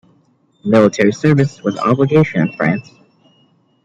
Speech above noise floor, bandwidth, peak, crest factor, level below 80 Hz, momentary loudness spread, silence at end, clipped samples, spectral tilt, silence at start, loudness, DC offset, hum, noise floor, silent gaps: 42 dB; 7.8 kHz; -2 dBFS; 14 dB; -54 dBFS; 6 LU; 1.05 s; under 0.1%; -7.5 dB/octave; 0.65 s; -14 LUFS; under 0.1%; none; -56 dBFS; none